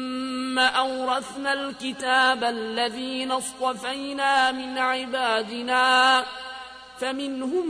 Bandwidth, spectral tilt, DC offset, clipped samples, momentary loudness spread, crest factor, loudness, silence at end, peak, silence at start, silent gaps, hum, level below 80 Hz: 11 kHz; -1.5 dB/octave; under 0.1%; under 0.1%; 11 LU; 16 dB; -24 LUFS; 0 s; -8 dBFS; 0 s; none; none; -64 dBFS